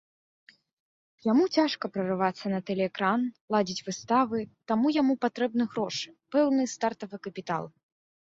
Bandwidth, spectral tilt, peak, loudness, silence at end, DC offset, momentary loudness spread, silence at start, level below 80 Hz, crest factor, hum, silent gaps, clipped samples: 8 kHz; -5 dB/octave; -12 dBFS; -28 LUFS; 0.7 s; under 0.1%; 10 LU; 1.25 s; -72 dBFS; 18 dB; none; 3.41-3.48 s; under 0.1%